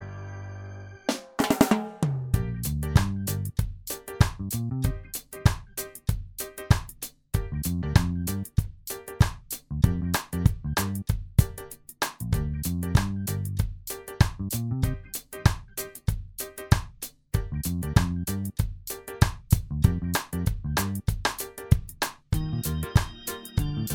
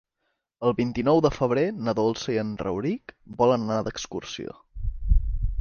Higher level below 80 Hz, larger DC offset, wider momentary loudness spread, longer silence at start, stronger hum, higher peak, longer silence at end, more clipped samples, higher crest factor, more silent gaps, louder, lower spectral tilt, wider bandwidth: about the same, -34 dBFS vs -32 dBFS; neither; second, 11 LU vs 14 LU; second, 0 s vs 0.6 s; neither; first, -2 dBFS vs -8 dBFS; about the same, 0 s vs 0 s; neither; first, 24 dB vs 18 dB; neither; about the same, -28 LUFS vs -26 LUFS; about the same, -5.5 dB/octave vs -6.5 dB/octave; first, over 20 kHz vs 7 kHz